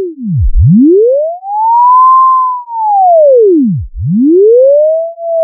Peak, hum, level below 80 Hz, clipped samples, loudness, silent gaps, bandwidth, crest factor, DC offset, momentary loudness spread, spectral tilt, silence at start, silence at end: 0 dBFS; none; -22 dBFS; under 0.1%; -7 LUFS; none; 1.2 kHz; 6 dB; under 0.1%; 10 LU; -18 dB/octave; 0 s; 0 s